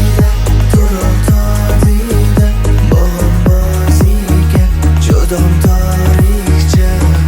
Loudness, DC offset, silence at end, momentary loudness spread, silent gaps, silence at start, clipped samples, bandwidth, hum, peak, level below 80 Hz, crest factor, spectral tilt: -11 LUFS; under 0.1%; 0 s; 2 LU; none; 0 s; under 0.1%; 18 kHz; none; 0 dBFS; -12 dBFS; 8 dB; -6.5 dB/octave